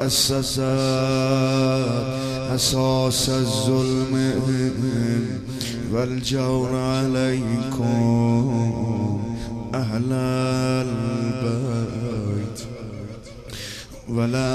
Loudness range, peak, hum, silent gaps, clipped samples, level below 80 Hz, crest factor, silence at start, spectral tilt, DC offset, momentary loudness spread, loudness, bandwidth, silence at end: 5 LU; -6 dBFS; none; none; under 0.1%; -44 dBFS; 16 dB; 0 s; -5.5 dB/octave; under 0.1%; 11 LU; -22 LUFS; 14 kHz; 0 s